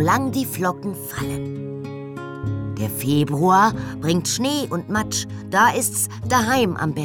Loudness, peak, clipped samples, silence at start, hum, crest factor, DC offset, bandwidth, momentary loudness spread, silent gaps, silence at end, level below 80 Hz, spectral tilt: -21 LUFS; -4 dBFS; under 0.1%; 0 s; none; 16 dB; under 0.1%; over 20 kHz; 13 LU; none; 0 s; -48 dBFS; -4.5 dB/octave